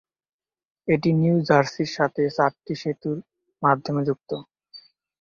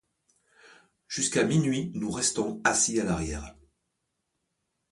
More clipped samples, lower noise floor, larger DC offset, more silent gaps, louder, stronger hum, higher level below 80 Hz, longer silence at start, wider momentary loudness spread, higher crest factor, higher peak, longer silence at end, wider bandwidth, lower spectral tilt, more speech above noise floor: neither; second, -50 dBFS vs -80 dBFS; neither; neither; first, -23 LUFS vs -27 LUFS; neither; second, -62 dBFS vs -50 dBFS; second, 0.85 s vs 1.1 s; about the same, 12 LU vs 12 LU; about the same, 20 dB vs 22 dB; first, -4 dBFS vs -8 dBFS; second, 0.4 s vs 1.4 s; second, 7.2 kHz vs 11.5 kHz; first, -7 dB/octave vs -3.5 dB/octave; second, 28 dB vs 53 dB